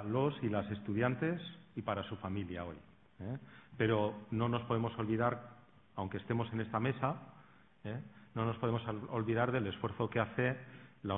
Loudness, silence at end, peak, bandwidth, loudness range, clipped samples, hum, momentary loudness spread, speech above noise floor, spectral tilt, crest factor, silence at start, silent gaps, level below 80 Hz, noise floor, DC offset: -37 LUFS; 0 s; -16 dBFS; 3.9 kHz; 3 LU; under 0.1%; none; 13 LU; 26 dB; -6 dB/octave; 22 dB; 0 s; none; -66 dBFS; -63 dBFS; under 0.1%